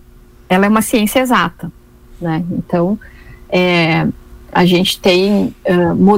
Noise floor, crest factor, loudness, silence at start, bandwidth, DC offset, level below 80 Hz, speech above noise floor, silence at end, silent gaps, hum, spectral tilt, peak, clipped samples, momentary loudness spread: -41 dBFS; 12 dB; -14 LUFS; 0.5 s; 16.5 kHz; under 0.1%; -40 dBFS; 29 dB; 0 s; none; none; -5.5 dB/octave; -2 dBFS; under 0.1%; 9 LU